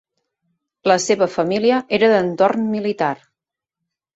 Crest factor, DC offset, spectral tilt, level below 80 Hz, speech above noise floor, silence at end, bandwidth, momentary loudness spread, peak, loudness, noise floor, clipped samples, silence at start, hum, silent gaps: 18 dB; under 0.1%; -4.5 dB/octave; -62 dBFS; 67 dB; 1 s; 8.2 kHz; 7 LU; -2 dBFS; -18 LUFS; -84 dBFS; under 0.1%; 0.85 s; none; none